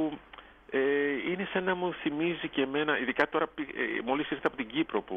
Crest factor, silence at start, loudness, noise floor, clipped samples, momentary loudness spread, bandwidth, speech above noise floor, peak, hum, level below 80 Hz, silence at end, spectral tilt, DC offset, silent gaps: 20 dB; 0 s; -31 LUFS; -52 dBFS; under 0.1%; 6 LU; 6.2 kHz; 21 dB; -12 dBFS; none; -64 dBFS; 0 s; -7 dB/octave; under 0.1%; none